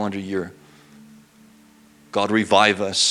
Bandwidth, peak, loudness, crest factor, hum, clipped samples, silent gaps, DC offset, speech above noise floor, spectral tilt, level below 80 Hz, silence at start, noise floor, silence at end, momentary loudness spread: 14.5 kHz; 0 dBFS; -20 LUFS; 22 dB; none; under 0.1%; none; under 0.1%; 32 dB; -3 dB/octave; -66 dBFS; 0 s; -52 dBFS; 0 s; 13 LU